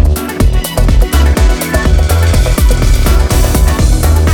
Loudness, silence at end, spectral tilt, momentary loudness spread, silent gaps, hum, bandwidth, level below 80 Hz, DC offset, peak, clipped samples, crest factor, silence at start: -11 LUFS; 0 s; -5.5 dB/octave; 3 LU; none; none; 19 kHz; -10 dBFS; under 0.1%; 0 dBFS; under 0.1%; 8 dB; 0 s